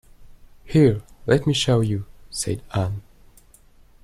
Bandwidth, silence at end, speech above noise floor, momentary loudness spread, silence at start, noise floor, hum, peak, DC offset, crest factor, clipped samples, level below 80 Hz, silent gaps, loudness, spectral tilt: 14 kHz; 1 s; 32 dB; 12 LU; 0.2 s; -52 dBFS; none; -4 dBFS; under 0.1%; 18 dB; under 0.1%; -46 dBFS; none; -22 LUFS; -5.5 dB/octave